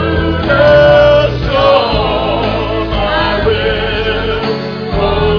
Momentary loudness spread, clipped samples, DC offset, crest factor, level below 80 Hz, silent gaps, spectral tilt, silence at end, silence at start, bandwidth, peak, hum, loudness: 9 LU; under 0.1%; 0.4%; 10 dB; -22 dBFS; none; -7 dB/octave; 0 s; 0 s; 5.4 kHz; 0 dBFS; none; -11 LUFS